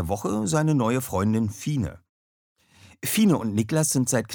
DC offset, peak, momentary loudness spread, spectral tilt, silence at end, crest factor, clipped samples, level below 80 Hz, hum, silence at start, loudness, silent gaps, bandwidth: under 0.1%; -8 dBFS; 7 LU; -5.5 dB/octave; 0 s; 16 dB; under 0.1%; -52 dBFS; none; 0 s; -24 LUFS; 2.09-2.56 s; over 20 kHz